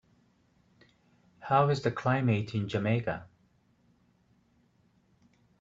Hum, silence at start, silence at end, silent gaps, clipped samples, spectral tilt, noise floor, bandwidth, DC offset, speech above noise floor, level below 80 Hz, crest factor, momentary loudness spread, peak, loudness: none; 1.4 s; 2.35 s; none; under 0.1%; -7.5 dB/octave; -68 dBFS; 7.6 kHz; under 0.1%; 40 dB; -66 dBFS; 22 dB; 11 LU; -12 dBFS; -29 LUFS